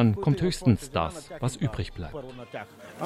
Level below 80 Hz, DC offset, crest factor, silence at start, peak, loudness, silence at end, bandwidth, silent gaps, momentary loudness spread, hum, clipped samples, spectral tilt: -46 dBFS; under 0.1%; 18 dB; 0 s; -8 dBFS; -28 LUFS; 0 s; 13.5 kHz; none; 16 LU; none; under 0.1%; -6.5 dB/octave